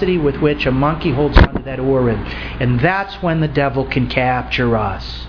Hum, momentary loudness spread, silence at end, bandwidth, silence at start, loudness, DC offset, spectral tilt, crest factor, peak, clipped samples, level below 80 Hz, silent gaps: none; 6 LU; 0 s; 5.4 kHz; 0 s; -17 LUFS; under 0.1%; -8.5 dB/octave; 16 dB; 0 dBFS; 0.1%; -24 dBFS; none